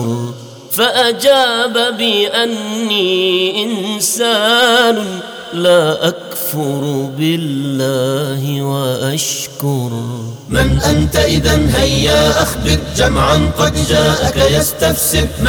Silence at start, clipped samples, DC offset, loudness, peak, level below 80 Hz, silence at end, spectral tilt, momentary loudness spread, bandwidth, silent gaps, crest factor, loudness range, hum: 0 s; under 0.1%; under 0.1%; -13 LUFS; -2 dBFS; -26 dBFS; 0 s; -4 dB/octave; 8 LU; over 20 kHz; none; 12 dB; 4 LU; none